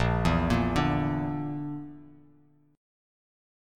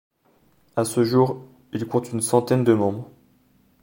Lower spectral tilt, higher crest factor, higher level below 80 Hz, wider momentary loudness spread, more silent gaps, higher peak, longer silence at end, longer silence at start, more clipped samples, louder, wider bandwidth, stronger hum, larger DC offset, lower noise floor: about the same, -7 dB/octave vs -6 dB/octave; about the same, 18 dB vs 20 dB; first, -40 dBFS vs -64 dBFS; about the same, 13 LU vs 15 LU; neither; second, -12 dBFS vs -2 dBFS; first, 0.95 s vs 0.8 s; second, 0 s vs 0.75 s; neither; second, -28 LUFS vs -22 LUFS; second, 13.5 kHz vs 17 kHz; neither; neither; about the same, -61 dBFS vs -61 dBFS